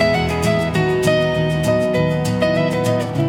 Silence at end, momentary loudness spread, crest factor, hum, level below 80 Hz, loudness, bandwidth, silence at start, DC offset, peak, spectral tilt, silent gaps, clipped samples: 0 s; 2 LU; 14 dB; none; -40 dBFS; -17 LUFS; 17.5 kHz; 0 s; under 0.1%; -2 dBFS; -6 dB/octave; none; under 0.1%